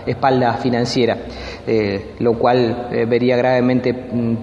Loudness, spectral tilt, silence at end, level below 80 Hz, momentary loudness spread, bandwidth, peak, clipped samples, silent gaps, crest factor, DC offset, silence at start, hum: -17 LUFS; -7 dB/octave; 0 s; -44 dBFS; 6 LU; 8.6 kHz; -2 dBFS; under 0.1%; none; 16 dB; 0.1%; 0 s; none